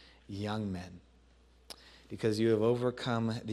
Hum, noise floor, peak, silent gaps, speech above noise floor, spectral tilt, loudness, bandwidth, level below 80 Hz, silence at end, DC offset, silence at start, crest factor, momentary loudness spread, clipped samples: none; -63 dBFS; -18 dBFS; none; 30 dB; -7 dB/octave; -33 LUFS; 13 kHz; -64 dBFS; 0 s; under 0.1%; 0.3 s; 18 dB; 22 LU; under 0.1%